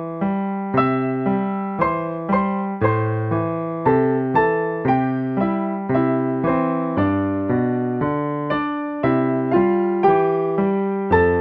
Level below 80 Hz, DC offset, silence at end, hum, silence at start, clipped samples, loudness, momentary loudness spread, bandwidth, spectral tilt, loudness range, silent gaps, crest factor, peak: -48 dBFS; under 0.1%; 0 s; none; 0 s; under 0.1%; -20 LUFS; 5 LU; 5.2 kHz; -11 dB/octave; 1 LU; none; 16 dB; -4 dBFS